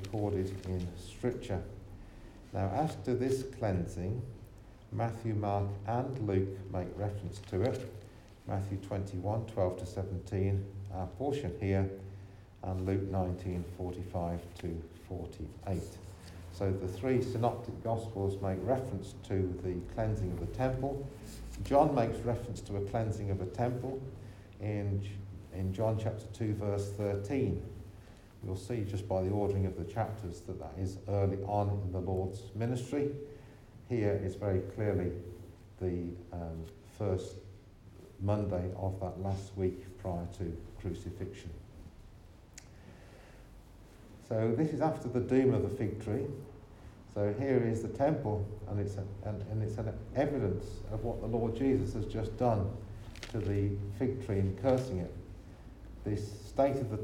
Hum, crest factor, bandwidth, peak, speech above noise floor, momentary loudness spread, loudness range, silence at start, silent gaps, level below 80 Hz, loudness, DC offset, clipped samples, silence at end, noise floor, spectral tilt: none; 22 dB; 12.5 kHz; -14 dBFS; 20 dB; 18 LU; 5 LU; 0 s; none; -52 dBFS; -35 LUFS; under 0.1%; under 0.1%; 0 s; -55 dBFS; -8 dB/octave